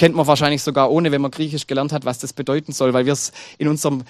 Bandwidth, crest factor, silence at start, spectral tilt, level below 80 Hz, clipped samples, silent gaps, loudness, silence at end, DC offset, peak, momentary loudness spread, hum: 15 kHz; 18 dB; 0 s; -5 dB/octave; -56 dBFS; under 0.1%; none; -19 LUFS; 0.05 s; under 0.1%; 0 dBFS; 8 LU; none